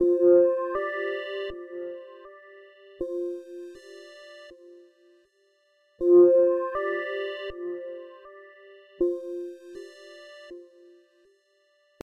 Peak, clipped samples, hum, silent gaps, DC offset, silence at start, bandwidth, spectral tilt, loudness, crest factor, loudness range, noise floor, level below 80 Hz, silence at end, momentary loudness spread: -10 dBFS; under 0.1%; none; none; under 0.1%; 0 s; 5.6 kHz; -6 dB/octave; -25 LUFS; 18 dB; 15 LU; -67 dBFS; -62 dBFS; 1.4 s; 27 LU